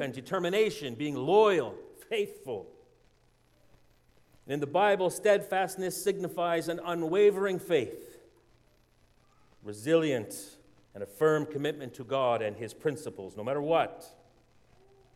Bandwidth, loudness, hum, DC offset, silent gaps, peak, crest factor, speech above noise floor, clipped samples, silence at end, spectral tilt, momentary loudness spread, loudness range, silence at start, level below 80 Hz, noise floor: 16 kHz; -30 LUFS; none; under 0.1%; none; -12 dBFS; 20 dB; 36 dB; under 0.1%; 1.1 s; -5 dB/octave; 16 LU; 5 LU; 0 s; -70 dBFS; -66 dBFS